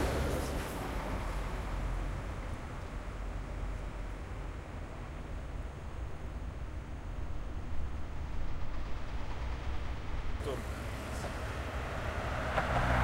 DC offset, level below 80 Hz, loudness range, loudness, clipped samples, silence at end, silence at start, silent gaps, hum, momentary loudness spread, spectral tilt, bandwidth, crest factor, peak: under 0.1%; -40 dBFS; 5 LU; -40 LUFS; under 0.1%; 0 s; 0 s; none; none; 9 LU; -5.5 dB/octave; 16.5 kHz; 18 dB; -18 dBFS